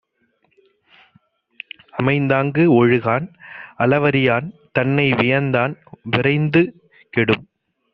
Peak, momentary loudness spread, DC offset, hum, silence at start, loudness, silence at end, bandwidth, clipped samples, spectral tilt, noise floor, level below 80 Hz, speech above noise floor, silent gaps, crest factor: -2 dBFS; 18 LU; under 0.1%; none; 1.95 s; -18 LUFS; 0.5 s; 5.6 kHz; under 0.1%; -5.5 dB/octave; -65 dBFS; -54 dBFS; 48 dB; none; 18 dB